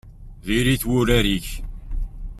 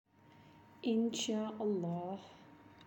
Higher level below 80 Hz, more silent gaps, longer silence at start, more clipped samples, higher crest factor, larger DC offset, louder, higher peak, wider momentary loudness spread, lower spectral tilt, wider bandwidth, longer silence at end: first, -30 dBFS vs -82 dBFS; neither; second, 0.05 s vs 0.35 s; neither; about the same, 18 dB vs 16 dB; neither; first, -20 LUFS vs -38 LUFS; first, -4 dBFS vs -24 dBFS; about the same, 17 LU vs 16 LU; about the same, -5 dB/octave vs -5 dB/octave; about the same, 16 kHz vs 17 kHz; about the same, 0 s vs 0 s